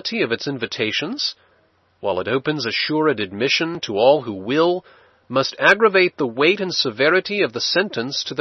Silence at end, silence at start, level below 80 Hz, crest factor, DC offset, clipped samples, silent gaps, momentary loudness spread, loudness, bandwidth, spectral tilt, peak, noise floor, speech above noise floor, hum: 0 s; 0.05 s; -66 dBFS; 20 dB; under 0.1%; under 0.1%; none; 8 LU; -19 LUFS; 6.8 kHz; -4 dB/octave; 0 dBFS; -60 dBFS; 40 dB; none